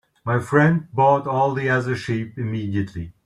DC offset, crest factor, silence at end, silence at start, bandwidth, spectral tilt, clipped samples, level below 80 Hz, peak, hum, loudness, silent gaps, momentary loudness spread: under 0.1%; 18 dB; 0.15 s; 0.25 s; 11.5 kHz; -7.5 dB/octave; under 0.1%; -54 dBFS; -2 dBFS; none; -21 LUFS; none; 9 LU